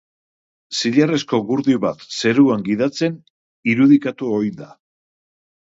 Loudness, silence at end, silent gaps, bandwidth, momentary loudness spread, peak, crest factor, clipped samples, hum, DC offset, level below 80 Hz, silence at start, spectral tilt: -18 LUFS; 1 s; 3.30-3.63 s; 7.8 kHz; 11 LU; -2 dBFS; 16 dB; under 0.1%; none; under 0.1%; -64 dBFS; 0.7 s; -5.5 dB/octave